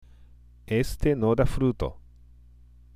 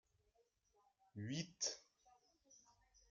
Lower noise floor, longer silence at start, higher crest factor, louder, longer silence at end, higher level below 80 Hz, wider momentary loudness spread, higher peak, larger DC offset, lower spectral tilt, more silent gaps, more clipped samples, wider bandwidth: second, -52 dBFS vs -81 dBFS; second, 0.7 s vs 1.15 s; second, 18 dB vs 24 dB; first, -26 LUFS vs -46 LUFS; first, 0.95 s vs 0.5 s; first, -36 dBFS vs -86 dBFS; second, 8 LU vs 13 LU; first, -10 dBFS vs -30 dBFS; neither; first, -7.5 dB/octave vs -3 dB/octave; neither; neither; first, 15.5 kHz vs 9.6 kHz